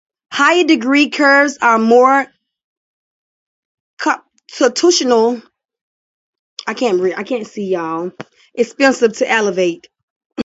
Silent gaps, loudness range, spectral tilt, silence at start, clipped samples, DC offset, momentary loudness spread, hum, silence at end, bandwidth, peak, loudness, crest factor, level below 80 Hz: 2.64-3.97 s, 5.81-6.33 s, 6.39-6.57 s, 10.03-10.30 s; 6 LU; -3 dB/octave; 0.3 s; under 0.1%; under 0.1%; 17 LU; none; 0 s; 8 kHz; 0 dBFS; -14 LUFS; 16 dB; -66 dBFS